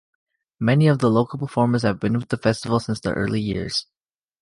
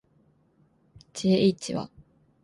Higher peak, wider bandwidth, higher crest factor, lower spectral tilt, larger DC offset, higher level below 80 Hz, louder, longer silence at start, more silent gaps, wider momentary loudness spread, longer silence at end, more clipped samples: first, -6 dBFS vs -10 dBFS; about the same, 11.5 kHz vs 11.5 kHz; about the same, 16 dB vs 20 dB; about the same, -6.5 dB/octave vs -6 dB/octave; neither; first, -48 dBFS vs -64 dBFS; first, -21 LUFS vs -26 LUFS; second, 0.6 s vs 1.15 s; neither; second, 8 LU vs 20 LU; about the same, 0.6 s vs 0.6 s; neither